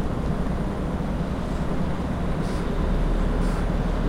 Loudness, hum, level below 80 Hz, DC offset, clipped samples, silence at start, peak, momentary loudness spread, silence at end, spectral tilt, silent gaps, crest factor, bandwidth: -27 LUFS; none; -28 dBFS; under 0.1%; under 0.1%; 0 s; -12 dBFS; 2 LU; 0 s; -7.5 dB/octave; none; 12 dB; 11 kHz